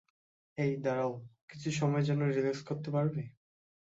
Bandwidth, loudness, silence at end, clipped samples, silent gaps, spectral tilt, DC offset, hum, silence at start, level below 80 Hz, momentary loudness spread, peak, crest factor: 7.8 kHz; -33 LUFS; 0.65 s; under 0.1%; 1.42-1.48 s; -7 dB/octave; under 0.1%; none; 0.55 s; -72 dBFS; 17 LU; -20 dBFS; 14 dB